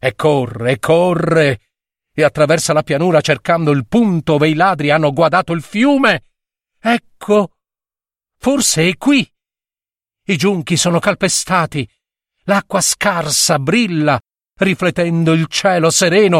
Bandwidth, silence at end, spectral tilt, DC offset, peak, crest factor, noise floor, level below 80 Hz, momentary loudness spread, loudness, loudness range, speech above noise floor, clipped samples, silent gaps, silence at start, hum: 16 kHz; 0 s; -4.5 dB/octave; under 0.1%; 0 dBFS; 14 dB; under -90 dBFS; -50 dBFS; 8 LU; -14 LUFS; 4 LU; over 76 dB; under 0.1%; none; 0.05 s; none